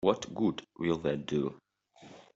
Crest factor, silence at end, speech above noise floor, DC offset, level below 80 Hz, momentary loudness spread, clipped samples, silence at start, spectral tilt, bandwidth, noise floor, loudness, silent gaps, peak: 22 dB; 0.15 s; 25 dB; under 0.1%; -66 dBFS; 6 LU; under 0.1%; 0 s; -6 dB/octave; 7.8 kHz; -57 dBFS; -33 LUFS; none; -10 dBFS